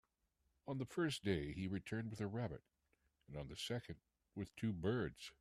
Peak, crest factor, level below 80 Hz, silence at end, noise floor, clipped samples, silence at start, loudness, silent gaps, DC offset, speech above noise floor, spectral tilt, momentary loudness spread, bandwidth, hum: -24 dBFS; 20 dB; -66 dBFS; 0.1 s; -84 dBFS; under 0.1%; 0.65 s; -44 LUFS; none; under 0.1%; 40 dB; -6 dB/octave; 15 LU; 14 kHz; none